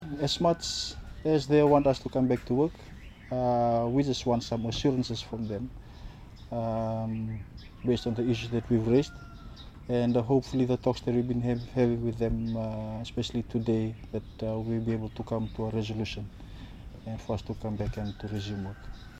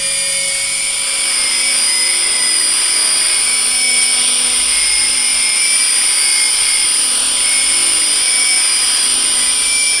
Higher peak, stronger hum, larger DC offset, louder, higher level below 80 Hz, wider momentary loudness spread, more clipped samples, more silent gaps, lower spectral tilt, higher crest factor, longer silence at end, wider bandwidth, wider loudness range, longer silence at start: second, -10 dBFS vs 0 dBFS; neither; second, under 0.1% vs 0.2%; second, -30 LUFS vs -10 LUFS; about the same, -46 dBFS vs -48 dBFS; first, 18 LU vs 3 LU; neither; neither; first, -6.5 dB/octave vs 3 dB/octave; first, 20 dB vs 14 dB; about the same, 0 s vs 0 s; about the same, 12 kHz vs 12 kHz; first, 7 LU vs 1 LU; about the same, 0 s vs 0 s